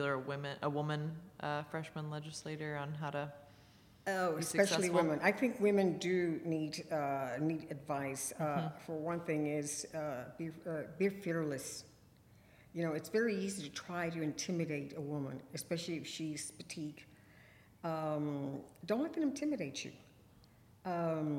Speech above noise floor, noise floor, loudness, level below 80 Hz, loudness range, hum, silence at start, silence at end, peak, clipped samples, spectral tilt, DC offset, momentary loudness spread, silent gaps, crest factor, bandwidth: 26 dB; -64 dBFS; -38 LUFS; -74 dBFS; 8 LU; none; 0 s; 0 s; -16 dBFS; under 0.1%; -5 dB/octave; under 0.1%; 12 LU; none; 22 dB; 16.5 kHz